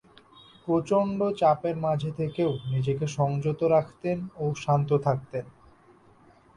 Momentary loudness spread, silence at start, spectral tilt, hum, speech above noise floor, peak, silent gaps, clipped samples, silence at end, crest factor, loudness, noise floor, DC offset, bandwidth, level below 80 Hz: 8 LU; 0.65 s; -8 dB/octave; none; 31 dB; -10 dBFS; none; under 0.1%; 1.05 s; 18 dB; -27 LUFS; -57 dBFS; under 0.1%; 10.5 kHz; -60 dBFS